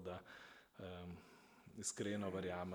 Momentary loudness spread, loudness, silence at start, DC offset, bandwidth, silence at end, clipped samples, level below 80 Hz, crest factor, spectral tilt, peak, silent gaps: 17 LU; -47 LUFS; 0 s; under 0.1%; over 20 kHz; 0 s; under 0.1%; -76 dBFS; 20 dB; -4.5 dB/octave; -30 dBFS; none